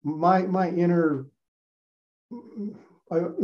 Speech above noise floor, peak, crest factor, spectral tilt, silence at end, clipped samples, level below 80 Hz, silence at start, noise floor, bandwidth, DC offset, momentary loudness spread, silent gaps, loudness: over 66 dB; -6 dBFS; 20 dB; -9.5 dB/octave; 0 s; under 0.1%; -78 dBFS; 0.05 s; under -90 dBFS; 6.4 kHz; under 0.1%; 19 LU; 1.48-2.29 s; -24 LUFS